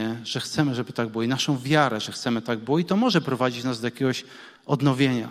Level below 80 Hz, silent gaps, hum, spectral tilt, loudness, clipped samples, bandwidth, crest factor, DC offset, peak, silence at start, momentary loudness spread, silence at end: -64 dBFS; none; none; -5.5 dB/octave; -24 LUFS; under 0.1%; 15 kHz; 18 dB; under 0.1%; -6 dBFS; 0 s; 7 LU; 0 s